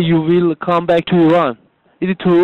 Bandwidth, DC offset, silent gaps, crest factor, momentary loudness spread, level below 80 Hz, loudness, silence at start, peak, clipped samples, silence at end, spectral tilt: 4.3 kHz; under 0.1%; none; 8 dB; 9 LU; -48 dBFS; -14 LUFS; 0 s; -6 dBFS; under 0.1%; 0 s; -9 dB/octave